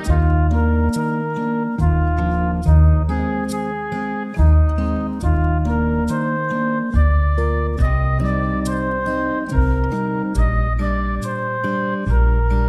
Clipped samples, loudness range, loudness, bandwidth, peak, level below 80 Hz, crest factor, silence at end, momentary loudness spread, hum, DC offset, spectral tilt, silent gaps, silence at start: under 0.1%; 2 LU; -19 LUFS; 10.5 kHz; -2 dBFS; -20 dBFS; 14 dB; 0 s; 6 LU; none; under 0.1%; -8.5 dB/octave; none; 0 s